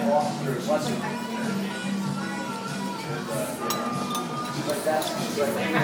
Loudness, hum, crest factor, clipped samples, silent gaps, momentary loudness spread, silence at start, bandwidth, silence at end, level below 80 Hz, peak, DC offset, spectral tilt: -28 LUFS; none; 16 dB; under 0.1%; none; 6 LU; 0 s; 19.5 kHz; 0 s; -66 dBFS; -12 dBFS; under 0.1%; -4.5 dB/octave